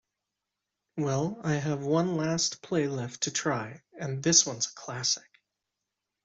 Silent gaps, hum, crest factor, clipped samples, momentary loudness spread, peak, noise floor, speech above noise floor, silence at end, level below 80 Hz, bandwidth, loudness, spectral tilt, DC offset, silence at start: none; none; 24 dB; under 0.1%; 12 LU; -6 dBFS; -86 dBFS; 57 dB; 1.05 s; -68 dBFS; 8.2 kHz; -28 LUFS; -3.5 dB/octave; under 0.1%; 0.95 s